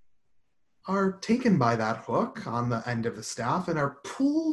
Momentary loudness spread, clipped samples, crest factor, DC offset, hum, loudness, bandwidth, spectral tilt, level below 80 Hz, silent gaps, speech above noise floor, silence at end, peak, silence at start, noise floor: 8 LU; under 0.1%; 18 dB; under 0.1%; none; -28 LUFS; 12 kHz; -6.5 dB/octave; -64 dBFS; none; 43 dB; 0 s; -10 dBFS; 0.85 s; -71 dBFS